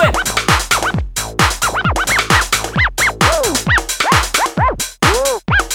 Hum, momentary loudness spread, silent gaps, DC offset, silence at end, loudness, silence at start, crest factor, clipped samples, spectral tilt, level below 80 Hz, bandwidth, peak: none; 4 LU; none; under 0.1%; 0 s; -14 LUFS; 0 s; 14 dB; under 0.1%; -3 dB/octave; -26 dBFS; over 20 kHz; 0 dBFS